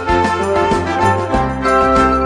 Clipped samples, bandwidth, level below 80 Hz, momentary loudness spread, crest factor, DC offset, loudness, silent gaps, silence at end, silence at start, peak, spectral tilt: under 0.1%; 11 kHz; -28 dBFS; 4 LU; 14 dB; under 0.1%; -14 LUFS; none; 0 s; 0 s; 0 dBFS; -6 dB/octave